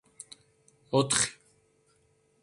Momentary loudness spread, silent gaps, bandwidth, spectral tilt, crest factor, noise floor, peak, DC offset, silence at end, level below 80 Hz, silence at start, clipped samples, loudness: 23 LU; none; 11.5 kHz; -3 dB/octave; 24 dB; -68 dBFS; -10 dBFS; under 0.1%; 1.1 s; -66 dBFS; 0.9 s; under 0.1%; -27 LUFS